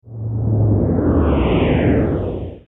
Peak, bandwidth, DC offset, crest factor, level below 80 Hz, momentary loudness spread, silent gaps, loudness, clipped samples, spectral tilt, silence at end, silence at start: -4 dBFS; 3.9 kHz; under 0.1%; 12 dB; -26 dBFS; 7 LU; none; -17 LUFS; under 0.1%; -11.5 dB/octave; 0.05 s; 0.05 s